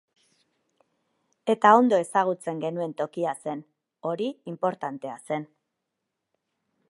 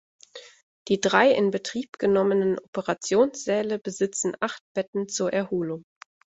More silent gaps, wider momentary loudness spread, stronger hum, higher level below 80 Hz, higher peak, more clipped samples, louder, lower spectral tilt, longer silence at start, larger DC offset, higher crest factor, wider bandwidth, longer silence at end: second, none vs 0.63-0.86 s, 2.68-2.73 s, 4.61-4.75 s, 4.88-4.93 s; first, 16 LU vs 12 LU; neither; second, -84 dBFS vs -66 dBFS; about the same, -4 dBFS vs -4 dBFS; neither; about the same, -26 LUFS vs -25 LUFS; first, -5.5 dB/octave vs -4 dB/octave; first, 1.45 s vs 0.35 s; neither; about the same, 24 dB vs 22 dB; first, 11.5 kHz vs 8.2 kHz; first, 1.45 s vs 0.5 s